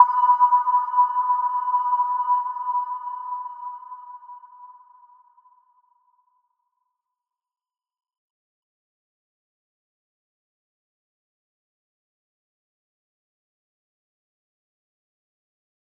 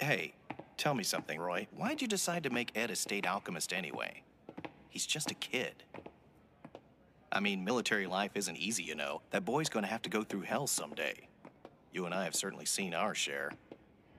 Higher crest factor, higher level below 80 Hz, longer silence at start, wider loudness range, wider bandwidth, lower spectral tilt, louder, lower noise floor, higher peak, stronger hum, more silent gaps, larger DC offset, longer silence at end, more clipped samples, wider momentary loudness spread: about the same, 26 dB vs 22 dB; second, under -90 dBFS vs -76 dBFS; about the same, 0 s vs 0 s; first, 22 LU vs 4 LU; second, 3.1 kHz vs 15.5 kHz; second, -0.5 dB/octave vs -3 dB/octave; first, -21 LUFS vs -36 LUFS; first, -86 dBFS vs -64 dBFS; first, -2 dBFS vs -16 dBFS; neither; neither; neither; first, 11.3 s vs 0 s; neither; first, 23 LU vs 16 LU